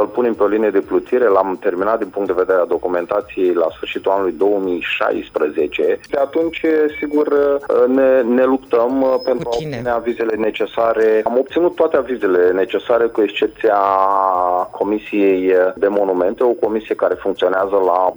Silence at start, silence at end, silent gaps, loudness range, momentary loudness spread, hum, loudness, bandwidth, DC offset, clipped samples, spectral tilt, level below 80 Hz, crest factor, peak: 0 s; 0 s; none; 2 LU; 5 LU; none; -16 LUFS; over 20 kHz; under 0.1%; under 0.1%; -6.5 dB/octave; -52 dBFS; 16 dB; 0 dBFS